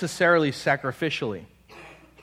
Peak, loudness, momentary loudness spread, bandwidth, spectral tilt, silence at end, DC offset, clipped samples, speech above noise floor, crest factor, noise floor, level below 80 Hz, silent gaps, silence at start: -8 dBFS; -24 LUFS; 12 LU; 15.5 kHz; -5 dB/octave; 0.3 s; under 0.1%; under 0.1%; 23 dB; 18 dB; -48 dBFS; -60 dBFS; none; 0 s